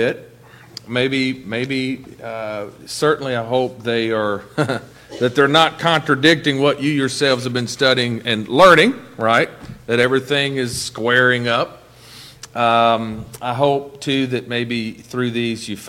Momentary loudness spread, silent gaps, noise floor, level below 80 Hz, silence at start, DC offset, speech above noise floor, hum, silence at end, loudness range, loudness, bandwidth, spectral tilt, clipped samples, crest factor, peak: 14 LU; none; -41 dBFS; -52 dBFS; 0 s; under 0.1%; 24 dB; none; 0 s; 6 LU; -17 LUFS; 16.5 kHz; -4.5 dB/octave; under 0.1%; 18 dB; 0 dBFS